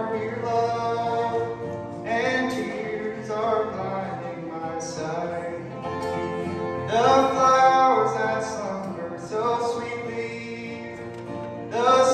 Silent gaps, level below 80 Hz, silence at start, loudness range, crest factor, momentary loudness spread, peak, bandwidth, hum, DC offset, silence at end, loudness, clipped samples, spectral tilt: none; -60 dBFS; 0 s; 8 LU; 18 dB; 15 LU; -6 dBFS; 12 kHz; none; under 0.1%; 0 s; -25 LUFS; under 0.1%; -5 dB/octave